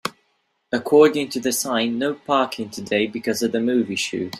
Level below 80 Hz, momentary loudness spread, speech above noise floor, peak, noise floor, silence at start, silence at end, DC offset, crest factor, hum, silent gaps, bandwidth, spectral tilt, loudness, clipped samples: -64 dBFS; 11 LU; 48 dB; -2 dBFS; -69 dBFS; 0.05 s; 0 s; under 0.1%; 18 dB; none; none; 15.5 kHz; -3.5 dB/octave; -21 LUFS; under 0.1%